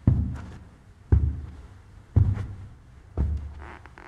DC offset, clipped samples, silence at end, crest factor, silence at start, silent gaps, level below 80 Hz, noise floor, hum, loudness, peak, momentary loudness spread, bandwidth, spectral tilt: under 0.1%; under 0.1%; 0 s; 22 dB; 0.05 s; none; -32 dBFS; -49 dBFS; none; -28 LUFS; -6 dBFS; 22 LU; 3.8 kHz; -10 dB/octave